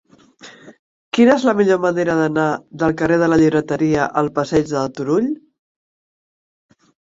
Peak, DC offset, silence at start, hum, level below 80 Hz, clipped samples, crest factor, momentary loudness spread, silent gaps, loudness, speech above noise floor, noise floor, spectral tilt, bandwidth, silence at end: -2 dBFS; under 0.1%; 0.45 s; none; -50 dBFS; under 0.1%; 16 dB; 8 LU; 0.79-1.12 s; -17 LUFS; 28 dB; -44 dBFS; -6.5 dB/octave; 7.8 kHz; 1.75 s